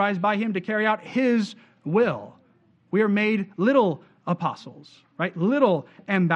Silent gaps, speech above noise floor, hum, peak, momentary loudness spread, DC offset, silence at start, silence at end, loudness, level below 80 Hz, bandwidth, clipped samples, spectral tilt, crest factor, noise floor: none; 37 dB; none; -6 dBFS; 11 LU; under 0.1%; 0 s; 0 s; -24 LUFS; -74 dBFS; 8.4 kHz; under 0.1%; -7.5 dB/octave; 18 dB; -61 dBFS